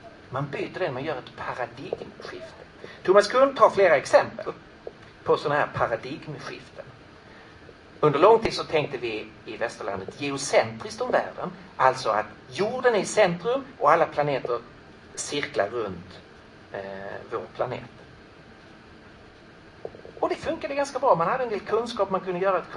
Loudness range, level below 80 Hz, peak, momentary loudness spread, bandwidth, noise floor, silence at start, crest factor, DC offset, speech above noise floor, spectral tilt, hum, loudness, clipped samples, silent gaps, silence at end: 12 LU; -60 dBFS; -2 dBFS; 20 LU; 11 kHz; -49 dBFS; 0.05 s; 24 dB; under 0.1%; 24 dB; -4.5 dB/octave; none; -25 LUFS; under 0.1%; none; 0 s